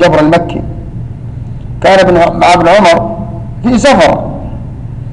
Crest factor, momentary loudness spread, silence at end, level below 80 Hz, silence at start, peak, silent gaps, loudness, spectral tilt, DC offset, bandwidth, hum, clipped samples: 8 dB; 18 LU; 0 s; -26 dBFS; 0 s; 0 dBFS; none; -7 LUFS; -5.5 dB/octave; under 0.1%; 11 kHz; none; under 0.1%